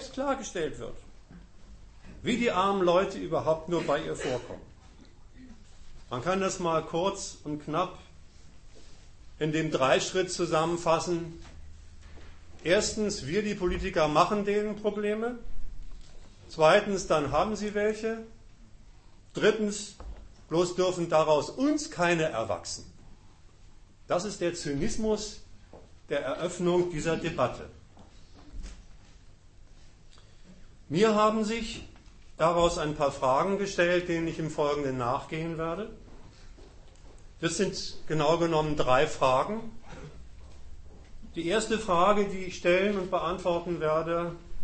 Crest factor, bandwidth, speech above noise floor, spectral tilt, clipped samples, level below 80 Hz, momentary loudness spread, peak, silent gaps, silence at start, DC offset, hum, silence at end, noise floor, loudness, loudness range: 22 dB; 8.8 kHz; 25 dB; -4.5 dB/octave; under 0.1%; -48 dBFS; 15 LU; -8 dBFS; none; 0 s; under 0.1%; none; 0 s; -53 dBFS; -28 LUFS; 6 LU